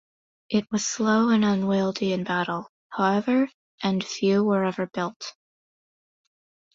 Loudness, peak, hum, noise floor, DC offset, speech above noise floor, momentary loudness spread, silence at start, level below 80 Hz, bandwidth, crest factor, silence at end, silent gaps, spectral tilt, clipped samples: -24 LUFS; -8 dBFS; none; under -90 dBFS; under 0.1%; over 67 dB; 9 LU; 0.5 s; -66 dBFS; 7.8 kHz; 16 dB; 1.45 s; 2.69-2.90 s, 3.54-3.78 s, 5.16-5.20 s; -5 dB/octave; under 0.1%